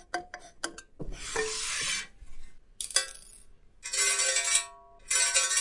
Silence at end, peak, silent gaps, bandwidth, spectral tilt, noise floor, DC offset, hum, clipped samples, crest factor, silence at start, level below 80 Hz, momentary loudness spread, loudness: 0 s; -8 dBFS; none; 11.5 kHz; 1 dB/octave; -53 dBFS; under 0.1%; none; under 0.1%; 24 dB; 0.15 s; -52 dBFS; 21 LU; -28 LUFS